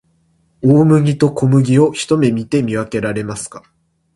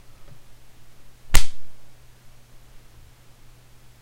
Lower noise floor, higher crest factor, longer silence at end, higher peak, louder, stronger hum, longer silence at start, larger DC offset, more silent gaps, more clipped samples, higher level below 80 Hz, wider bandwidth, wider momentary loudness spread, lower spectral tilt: first, -58 dBFS vs -48 dBFS; second, 14 dB vs 20 dB; second, 0.55 s vs 2.15 s; about the same, 0 dBFS vs 0 dBFS; first, -14 LUFS vs -26 LUFS; neither; second, 0.65 s vs 1.25 s; neither; neither; neither; second, -50 dBFS vs -30 dBFS; second, 11.5 kHz vs 16 kHz; second, 11 LU vs 29 LU; first, -7 dB/octave vs -2 dB/octave